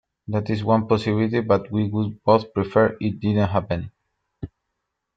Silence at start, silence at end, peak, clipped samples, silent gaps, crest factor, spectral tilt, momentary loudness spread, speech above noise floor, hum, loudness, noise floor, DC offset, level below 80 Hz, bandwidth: 0.3 s; 0.7 s; -4 dBFS; under 0.1%; none; 20 dB; -8.5 dB/octave; 17 LU; 58 dB; none; -22 LUFS; -79 dBFS; under 0.1%; -52 dBFS; 7.8 kHz